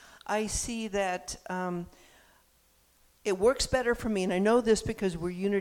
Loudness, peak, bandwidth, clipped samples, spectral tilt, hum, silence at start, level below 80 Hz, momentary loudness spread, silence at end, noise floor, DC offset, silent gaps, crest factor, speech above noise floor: -30 LUFS; -12 dBFS; 17 kHz; under 0.1%; -4.5 dB/octave; none; 0.15 s; -48 dBFS; 11 LU; 0 s; -66 dBFS; under 0.1%; none; 18 dB; 37 dB